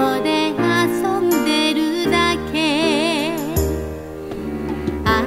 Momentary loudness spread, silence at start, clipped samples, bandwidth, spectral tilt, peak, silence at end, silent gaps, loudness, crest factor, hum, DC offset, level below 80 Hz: 10 LU; 0 s; under 0.1%; 16 kHz; -4.5 dB/octave; -4 dBFS; 0 s; none; -19 LUFS; 14 dB; none; under 0.1%; -34 dBFS